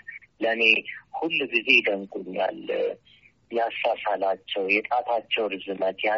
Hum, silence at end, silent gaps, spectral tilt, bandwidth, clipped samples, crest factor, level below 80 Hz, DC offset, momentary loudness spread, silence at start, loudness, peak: none; 0 s; none; 0 dB/octave; 7.4 kHz; under 0.1%; 22 dB; -72 dBFS; under 0.1%; 13 LU; 0.1 s; -24 LUFS; -4 dBFS